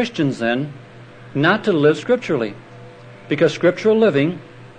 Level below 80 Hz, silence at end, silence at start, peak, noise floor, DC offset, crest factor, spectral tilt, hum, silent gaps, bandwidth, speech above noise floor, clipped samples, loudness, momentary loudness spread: -62 dBFS; 0.05 s; 0 s; -2 dBFS; -40 dBFS; under 0.1%; 16 dB; -6.5 dB/octave; none; none; 9.4 kHz; 23 dB; under 0.1%; -18 LUFS; 12 LU